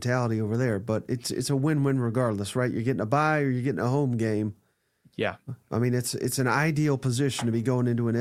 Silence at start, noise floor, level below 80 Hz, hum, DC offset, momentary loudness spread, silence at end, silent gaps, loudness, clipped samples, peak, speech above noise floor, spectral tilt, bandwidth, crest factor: 0 s; -64 dBFS; -62 dBFS; none; under 0.1%; 7 LU; 0 s; none; -26 LUFS; under 0.1%; -8 dBFS; 38 dB; -6 dB/octave; 15.5 kHz; 18 dB